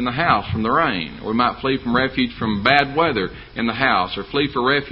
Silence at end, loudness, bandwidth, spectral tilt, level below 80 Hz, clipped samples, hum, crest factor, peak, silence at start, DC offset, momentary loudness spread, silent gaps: 0 s; -19 LUFS; 5.8 kHz; -7.5 dB/octave; -42 dBFS; under 0.1%; none; 20 dB; 0 dBFS; 0 s; under 0.1%; 8 LU; none